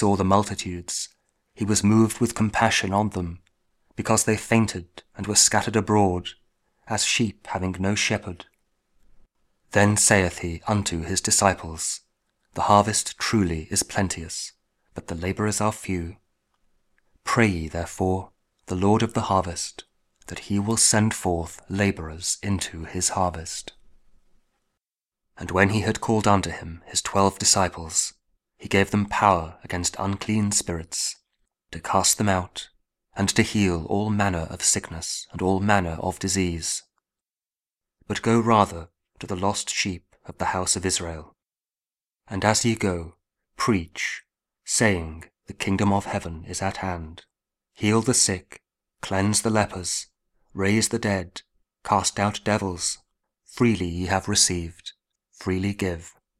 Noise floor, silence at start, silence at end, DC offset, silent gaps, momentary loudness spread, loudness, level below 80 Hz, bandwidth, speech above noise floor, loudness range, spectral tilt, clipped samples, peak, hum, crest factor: under -90 dBFS; 0 s; 0.3 s; under 0.1%; none; 16 LU; -23 LUFS; -48 dBFS; 15.5 kHz; over 66 dB; 5 LU; -3.5 dB/octave; under 0.1%; 0 dBFS; none; 24 dB